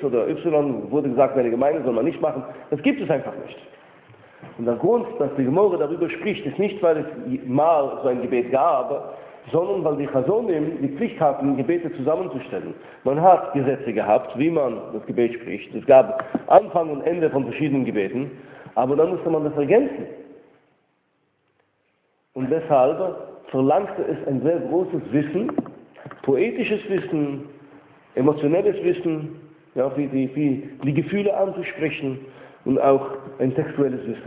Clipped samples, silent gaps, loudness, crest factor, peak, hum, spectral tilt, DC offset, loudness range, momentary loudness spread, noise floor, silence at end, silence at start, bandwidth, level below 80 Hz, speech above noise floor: under 0.1%; none; -22 LUFS; 22 dB; 0 dBFS; none; -11.5 dB/octave; under 0.1%; 5 LU; 12 LU; -68 dBFS; 0 s; 0 s; 4 kHz; -62 dBFS; 47 dB